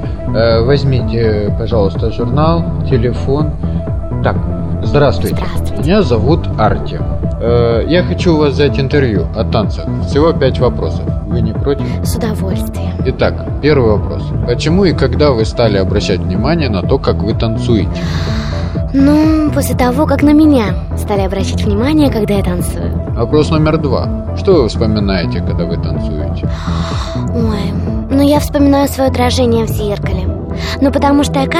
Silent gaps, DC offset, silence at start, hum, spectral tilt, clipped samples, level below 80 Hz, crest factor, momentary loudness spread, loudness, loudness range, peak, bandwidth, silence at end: none; under 0.1%; 0 s; none; -7 dB/octave; under 0.1%; -22 dBFS; 12 dB; 7 LU; -13 LUFS; 3 LU; 0 dBFS; 16 kHz; 0 s